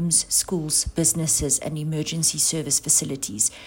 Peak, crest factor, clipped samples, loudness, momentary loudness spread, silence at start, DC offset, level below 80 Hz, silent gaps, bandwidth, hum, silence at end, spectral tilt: -6 dBFS; 18 dB; under 0.1%; -21 LUFS; 7 LU; 0 s; under 0.1%; -44 dBFS; none; 16.5 kHz; none; 0 s; -3 dB/octave